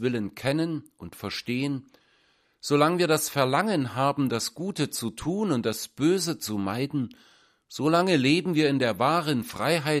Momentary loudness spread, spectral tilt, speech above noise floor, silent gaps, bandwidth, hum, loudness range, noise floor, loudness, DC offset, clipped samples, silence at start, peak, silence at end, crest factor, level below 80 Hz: 10 LU; -5 dB/octave; 40 dB; none; 15.5 kHz; none; 3 LU; -66 dBFS; -26 LUFS; under 0.1%; under 0.1%; 0 s; -6 dBFS; 0 s; 20 dB; -62 dBFS